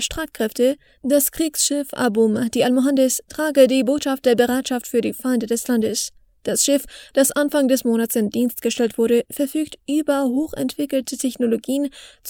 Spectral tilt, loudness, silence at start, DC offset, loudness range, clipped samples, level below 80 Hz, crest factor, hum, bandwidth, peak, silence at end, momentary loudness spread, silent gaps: -3.5 dB/octave; -20 LUFS; 0 s; under 0.1%; 3 LU; under 0.1%; -52 dBFS; 18 dB; none; over 20 kHz; -2 dBFS; 0 s; 7 LU; none